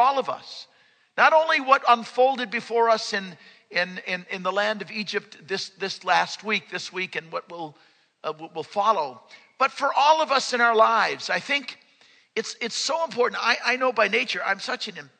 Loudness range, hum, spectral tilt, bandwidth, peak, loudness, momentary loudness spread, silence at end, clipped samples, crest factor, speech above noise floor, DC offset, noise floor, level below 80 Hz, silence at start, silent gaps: 6 LU; none; -2.5 dB/octave; 9.4 kHz; -2 dBFS; -23 LUFS; 15 LU; 0.15 s; under 0.1%; 22 dB; 34 dB; under 0.1%; -58 dBFS; -86 dBFS; 0 s; none